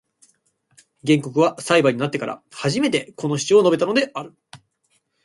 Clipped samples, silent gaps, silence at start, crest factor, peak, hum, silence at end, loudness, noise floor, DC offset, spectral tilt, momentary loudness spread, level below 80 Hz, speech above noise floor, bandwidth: under 0.1%; none; 1.05 s; 20 dB; -2 dBFS; none; 0.7 s; -20 LUFS; -68 dBFS; under 0.1%; -5 dB/octave; 13 LU; -64 dBFS; 48 dB; 11.5 kHz